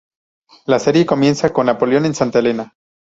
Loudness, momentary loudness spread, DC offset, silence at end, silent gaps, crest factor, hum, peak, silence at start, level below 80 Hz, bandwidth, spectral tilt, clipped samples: -15 LUFS; 10 LU; under 0.1%; 0.45 s; none; 16 dB; none; -2 dBFS; 0.7 s; -54 dBFS; 8 kHz; -6 dB/octave; under 0.1%